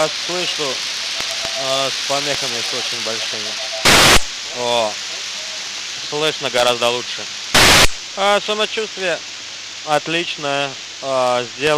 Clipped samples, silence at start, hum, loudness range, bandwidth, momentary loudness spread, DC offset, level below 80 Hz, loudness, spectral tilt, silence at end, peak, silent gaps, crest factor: under 0.1%; 0 s; none; 5 LU; 16 kHz; 14 LU; under 0.1%; -36 dBFS; -17 LUFS; -1.5 dB/octave; 0 s; 0 dBFS; none; 18 dB